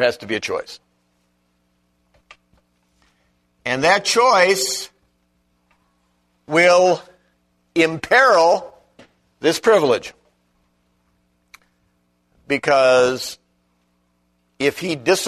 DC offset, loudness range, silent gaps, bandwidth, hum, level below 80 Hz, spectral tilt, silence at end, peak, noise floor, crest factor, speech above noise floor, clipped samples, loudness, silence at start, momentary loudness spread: under 0.1%; 7 LU; none; 13.5 kHz; 60 Hz at -60 dBFS; -60 dBFS; -3 dB/octave; 0 s; -2 dBFS; -65 dBFS; 20 dB; 49 dB; under 0.1%; -17 LUFS; 0 s; 14 LU